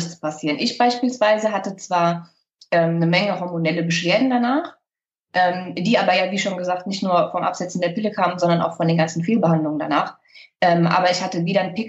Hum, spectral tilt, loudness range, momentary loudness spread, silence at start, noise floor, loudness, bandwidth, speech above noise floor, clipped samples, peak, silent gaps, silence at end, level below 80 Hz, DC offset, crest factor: none; -5.5 dB/octave; 1 LU; 7 LU; 0 s; -85 dBFS; -20 LUFS; 8.2 kHz; 66 dB; under 0.1%; -4 dBFS; none; 0 s; -70 dBFS; under 0.1%; 16 dB